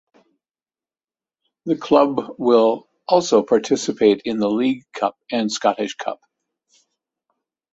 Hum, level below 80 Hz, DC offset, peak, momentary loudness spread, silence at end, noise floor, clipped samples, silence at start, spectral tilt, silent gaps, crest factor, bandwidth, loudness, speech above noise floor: none; -64 dBFS; under 0.1%; 0 dBFS; 10 LU; 1.6 s; under -90 dBFS; under 0.1%; 1.65 s; -4.5 dB/octave; none; 20 dB; 8 kHz; -19 LUFS; over 72 dB